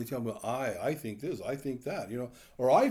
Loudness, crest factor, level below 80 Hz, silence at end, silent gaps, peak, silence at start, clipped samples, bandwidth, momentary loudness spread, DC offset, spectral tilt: -34 LUFS; 18 dB; -66 dBFS; 0 s; none; -12 dBFS; 0 s; under 0.1%; over 20 kHz; 10 LU; under 0.1%; -6 dB/octave